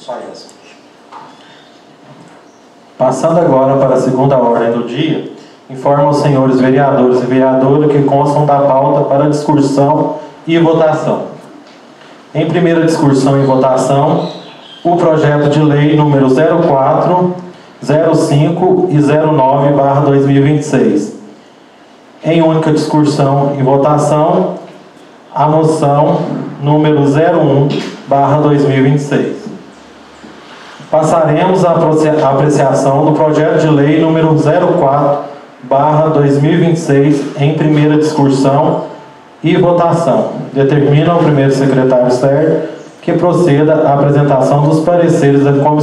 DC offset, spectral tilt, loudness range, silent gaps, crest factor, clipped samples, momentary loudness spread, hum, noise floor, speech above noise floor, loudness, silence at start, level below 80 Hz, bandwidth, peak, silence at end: under 0.1%; -7.5 dB/octave; 3 LU; none; 10 dB; under 0.1%; 8 LU; none; -40 dBFS; 31 dB; -10 LUFS; 0.05 s; -50 dBFS; 11.5 kHz; 0 dBFS; 0 s